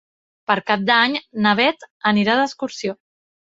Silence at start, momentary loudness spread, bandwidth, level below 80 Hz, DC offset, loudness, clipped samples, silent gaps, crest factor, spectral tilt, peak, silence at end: 0.5 s; 12 LU; 7.8 kHz; -64 dBFS; under 0.1%; -19 LUFS; under 0.1%; 1.90-2.00 s; 20 dB; -4.5 dB/octave; -2 dBFS; 0.6 s